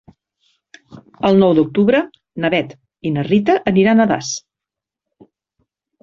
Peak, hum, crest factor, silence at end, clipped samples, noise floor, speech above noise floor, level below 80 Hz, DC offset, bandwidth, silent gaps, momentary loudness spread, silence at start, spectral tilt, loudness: -2 dBFS; none; 16 dB; 1.65 s; under 0.1%; -86 dBFS; 71 dB; -54 dBFS; under 0.1%; 7.6 kHz; none; 14 LU; 0.9 s; -6 dB/octave; -16 LUFS